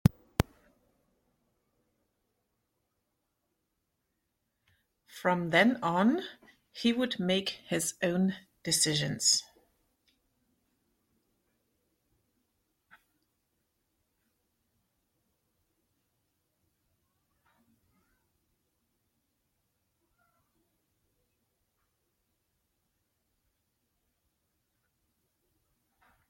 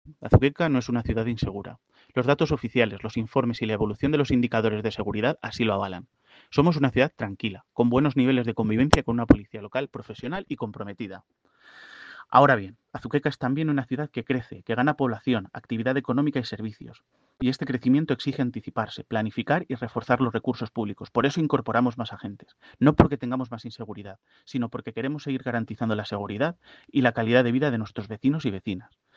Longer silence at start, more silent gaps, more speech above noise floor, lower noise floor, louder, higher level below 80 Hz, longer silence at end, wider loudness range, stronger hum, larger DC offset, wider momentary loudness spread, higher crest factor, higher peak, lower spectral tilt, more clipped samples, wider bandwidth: about the same, 0.05 s vs 0.05 s; neither; first, 53 dB vs 25 dB; first, -82 dBFS vs -50 dBFS; second, -29 LUFS vs -25 LUFS; second, -60 dBFS vs -46 dBFS; first, 16.9 s vs 0.35 s; first, 8 LU vs 4 LU; neither; neither; second, 9 LU vs 14 LU; first, 32 dB vs 26 dB; second, -6 dBFS vs 0 dBFS; second, -3.5 dB/octave vs -7 dB/octave; neither; first, 16.5 kHz vs 9 kHz